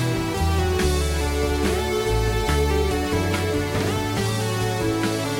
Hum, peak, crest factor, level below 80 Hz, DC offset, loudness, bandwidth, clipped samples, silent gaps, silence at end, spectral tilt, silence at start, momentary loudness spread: none; -10 dBFS; 12 dB; -30 dBFS; under 0.1%; -23 LUFS; 17 kHz; under 0.1%; none; 0 s; -5 dB/octave; 0 s; 2 LU